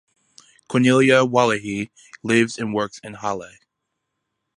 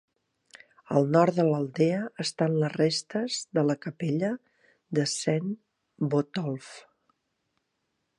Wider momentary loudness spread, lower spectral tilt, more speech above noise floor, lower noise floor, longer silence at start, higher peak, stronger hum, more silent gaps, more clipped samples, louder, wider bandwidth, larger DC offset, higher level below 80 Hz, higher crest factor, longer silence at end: first, 15 LU vs 10 LU; about the same, -5 dB/octave vs -5.5 dB/octave; first, 59 dB vs 52 dB; about the same, -79 dBFS vs -79 dBFS; second, 0.7 s vs 0.9 s; first, -2 dBFS vs -8 dBFS; neither; neither; neither; first, -19 LUFS vs -27 LUFS; about the same, 11.5 kHz vs 11.5 kHz; neither; first, -62 dBFS vs -76 dBFS; about the same, 20 dB vs 20 dB; second, 1.1 s vs 1.4 s